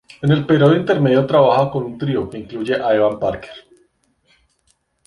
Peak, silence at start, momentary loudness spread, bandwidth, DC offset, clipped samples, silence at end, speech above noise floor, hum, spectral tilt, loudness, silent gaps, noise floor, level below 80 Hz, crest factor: -2 dBFS; 0.2 s; 12 LU; 11 kHz; under 0.1%; under 0.1%; 1.45 s; 48 dB; none; -8.5 dB/octave; -16 LUFS; none; -64 dBFS; -50 dBFS; 16 dB